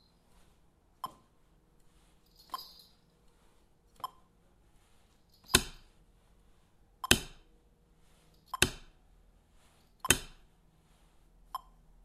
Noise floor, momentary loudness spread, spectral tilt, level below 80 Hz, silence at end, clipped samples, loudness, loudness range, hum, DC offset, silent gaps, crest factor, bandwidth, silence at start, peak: -66 dBFS; 23 LU; -1.5 dB/octave; -54 dBFS; 0.45 s; under 0.1%; -33 LUFS; 17 LU; none; under 0.1%; none; 36 dB; 15.5 kHz; 1.05 s; -4 dBFS